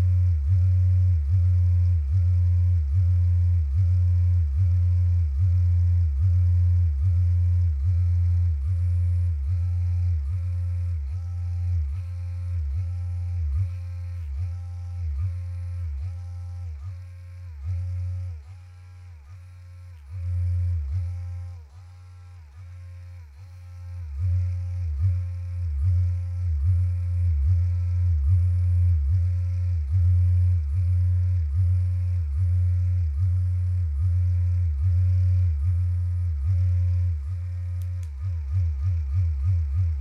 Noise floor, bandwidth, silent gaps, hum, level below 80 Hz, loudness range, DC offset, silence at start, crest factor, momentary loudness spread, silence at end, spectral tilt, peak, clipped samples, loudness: -44 dBFS; 2.5 kHz; none; none; -32 dBFS; 11 LU; under 0.1%; 0 s; 10 dB; 15 LU; 0 s; -9 dB/octave; -12 dBFS; under 0.1%; -25 LUFS